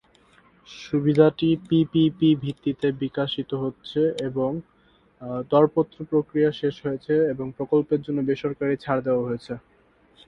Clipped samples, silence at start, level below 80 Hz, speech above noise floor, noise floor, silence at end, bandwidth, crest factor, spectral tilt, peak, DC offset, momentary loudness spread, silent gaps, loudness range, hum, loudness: under 0.1%; 0.7 s; -58 dBFS; 36 dB; -59 dBFS; 0.7 s; 9.6 kHz; 20 dB; -8 dB/octave; -4 dBFS; under 0.1%; 12 LU; none; 3 LU; none; -24 LUFS